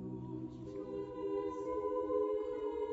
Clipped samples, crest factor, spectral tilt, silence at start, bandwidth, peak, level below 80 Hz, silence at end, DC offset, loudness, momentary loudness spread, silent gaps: under 0.1%; 14 dB; -7.5 dB/octave; 0 s; 7.6 kHz; -24 dBFS; -64 dBFS; 0 s; under 0.1%; -39 LUFS; 10 LU; none